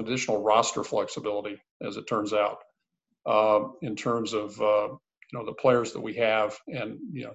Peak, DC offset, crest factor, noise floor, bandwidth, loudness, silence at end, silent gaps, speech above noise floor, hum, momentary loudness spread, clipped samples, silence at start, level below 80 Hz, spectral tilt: -8 dBFS; under 0.1%; 20 dB; -81 dBFS; 8.4 kHz; -27 LUFS; 0 s; 1.71-1.80 s; 54 dB; none; 14 LU; under 0.1%; 0 s; -68 dBFS; -4.5 dB/octave